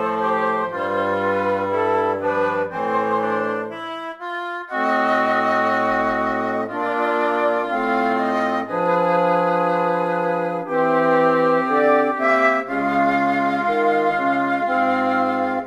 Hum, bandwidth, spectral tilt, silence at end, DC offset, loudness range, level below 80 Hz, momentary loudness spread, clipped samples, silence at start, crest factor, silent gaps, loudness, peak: none; 12 kHz; -6.5 dB/octave; 0 s; under 0.1%; 4 LU; -58 dBFS; 6 LU; under 0.1%; 0 s; 16 dB; none; -20 LUFS; -4 dBFS